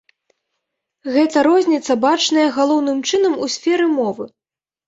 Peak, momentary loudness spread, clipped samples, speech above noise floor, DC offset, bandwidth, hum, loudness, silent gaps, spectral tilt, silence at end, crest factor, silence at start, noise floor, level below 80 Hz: -4 dBFS; 8 LU; under 0.1%; 61 dB; under 0.1%; 8 kHz; none; -16 LUFS; none; -3 dB/octave; 0.6 s; 14 dB; 1.05 s; -77 dBFS; -64 dBFS